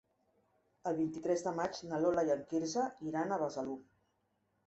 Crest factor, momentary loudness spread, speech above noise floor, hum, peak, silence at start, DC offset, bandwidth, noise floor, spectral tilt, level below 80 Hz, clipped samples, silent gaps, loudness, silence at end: 18 dB; 8 LU; 44 dB; none; -20 dBFS; 0.85 s; under 0.1%; 8 kHz; -79 dBFS; -5.5 dB/octave; -74 dBFS; under 0.1%; none; -36 LUFS; 0.85 s